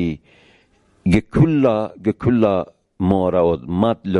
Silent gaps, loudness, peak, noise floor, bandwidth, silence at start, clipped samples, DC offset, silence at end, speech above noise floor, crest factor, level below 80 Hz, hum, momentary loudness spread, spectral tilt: none; -18 LUFS; -4 dBFS; -57 dBFS; 11.5 kHz; 0 s; under 0.1%; under 0.1%; 0 s; 40 dB; 16 dB; -38 dBFS; none; 10 LU; -9 dB/octave